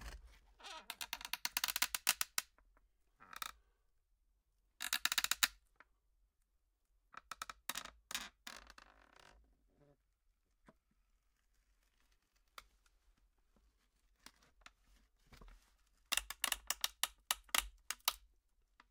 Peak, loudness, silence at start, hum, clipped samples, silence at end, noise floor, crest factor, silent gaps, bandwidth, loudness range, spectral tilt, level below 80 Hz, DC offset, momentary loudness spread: -12 dBFS; -39 LUFS; 0 s; none; under 0.1%; 0.7 s; -81 dBFS; 36 dB; none; 18 kHz; 10 LU; 1.5 dB/octave; -68 dBFS; under 0.1%; 22 LU